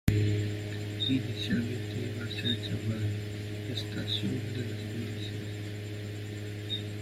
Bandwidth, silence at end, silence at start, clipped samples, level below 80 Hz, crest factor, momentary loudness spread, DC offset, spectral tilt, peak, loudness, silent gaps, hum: 15.5 kHz; 0 s; 0.05 s; under 0.1%; -50 dBFS; 22 dB; 9 LU; under 0.1%; -6 dB/octave; -12 dBFS; -34 LUFS; none; none